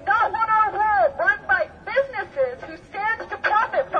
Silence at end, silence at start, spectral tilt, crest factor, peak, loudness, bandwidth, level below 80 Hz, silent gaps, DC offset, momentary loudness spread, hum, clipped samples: 0 s; 0 s; -5 dB/octave; 14 dB; -8 dBFS; -21 LUFS; 7 kHz; -54 dBFS; none; under 0.1%; 8 LU; none; under 0.1%